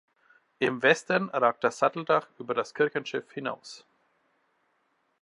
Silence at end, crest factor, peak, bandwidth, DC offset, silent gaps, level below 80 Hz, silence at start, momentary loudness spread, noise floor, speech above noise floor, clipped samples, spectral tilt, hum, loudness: 1.45 s; 24 dB; -6 dBFS; 11.5 kHz; under 0.1%; none; -80 dBFS; 0.6 s; 12 LU; -73 dBFS; 45 dB; under 0.1%; -4.5 dB/octave; none; -27 LUFS